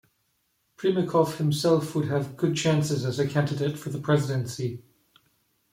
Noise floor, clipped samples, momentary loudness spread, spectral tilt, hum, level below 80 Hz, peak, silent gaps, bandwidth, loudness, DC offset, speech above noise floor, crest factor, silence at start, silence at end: -72 dBFS; under 0.1%; 8 LU; -6 dB/octave; none; -64 dBFS; -8 dBFS; none; 16 kHz; -26 LUFS; under 0.1%; 47 dB; 18 dB; 0.8 s; 0.95 s